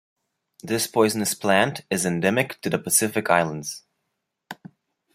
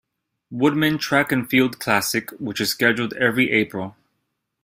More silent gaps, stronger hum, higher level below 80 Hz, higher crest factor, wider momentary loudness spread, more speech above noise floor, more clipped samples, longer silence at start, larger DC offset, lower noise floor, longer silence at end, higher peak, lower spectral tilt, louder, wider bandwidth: neither; neither; about the same, -64 dBFS vs -60 dBFS; about the same, 22 dB vs 20 dB; first, 21 LU vs 9 LU; about the same, 56 dB vs 55 dB; neither; first, 0.65 s vs 0.5 s; neither; first, -79 dBFS vs -75 dBFS; about the same, 0.6 s vs 0.7 s; about the same, -2 dBFS vs -2 dBFS; about the same, -3.5 dB/octave vs -4 dB/octave; about the same, -22 LUFS vs -20 LUFS; about the same, 16 kHz vs 16 kHz